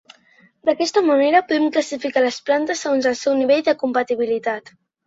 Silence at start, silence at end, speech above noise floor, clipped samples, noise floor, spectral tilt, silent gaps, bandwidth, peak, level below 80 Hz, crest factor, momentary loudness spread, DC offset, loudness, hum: 0.65 s; 0.5 s; 36 dB; under 0.1%; -55 dBFS; -3 dB/octave; none; 8 kHz; -4 dBFS; -68 dBFS; 16 dB; 6 LU; under 0.1%; -19 LUFS; none